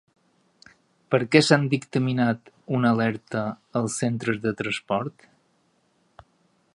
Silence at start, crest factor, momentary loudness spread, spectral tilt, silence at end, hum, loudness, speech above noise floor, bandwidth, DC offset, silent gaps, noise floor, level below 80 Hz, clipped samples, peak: 1.1 s; 24 dB; 10 LU; -5.5 dB/octave; 1.65 s; none; -24 LUFS; 43 dB; 11.5 kHz; under 0.1%; none; -67 dBFS; -64 dBFS; under 0.1%; 0 dBFS